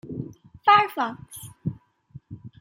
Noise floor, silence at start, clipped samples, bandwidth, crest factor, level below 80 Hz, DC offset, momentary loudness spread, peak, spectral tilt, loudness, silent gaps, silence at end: -49 dBFS; 0.05 s; under 0.1%; 16.5 kHz; 22 dB; -60 dBFS; under 0.1%; 25 LU; -4 dBFS; -4.5 dB/octave; -23 LUFS; none; 0.1 s